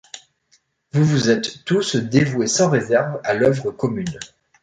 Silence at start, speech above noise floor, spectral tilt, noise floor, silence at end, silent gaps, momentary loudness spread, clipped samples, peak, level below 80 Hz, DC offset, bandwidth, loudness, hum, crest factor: 0.15 s; 43 dB; -5 dB/octave; -62 dBFS; 0.35 s; none; 14 LU; under 0.1%; -4 dBFS; -54 dBFS; under 0.1%; 9.4 kHz; -19 LUFS; none; 16 dB